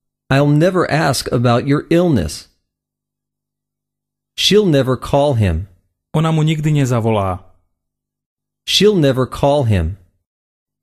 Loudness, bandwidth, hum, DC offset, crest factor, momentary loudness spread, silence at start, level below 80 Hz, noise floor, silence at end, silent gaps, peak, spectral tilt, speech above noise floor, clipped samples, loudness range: -15 LUFS; 14.5 kHz; 50 Hz at -40 dBFS; under 0.1%; 16 dB; 13 LU; 0.3 s; -36 dBFS; -82 dBFS; 0.85 s; 8.26-8.37 s; -2 dBFS; -6 dB/octave; 68 dB; under 0.1%; 3 LU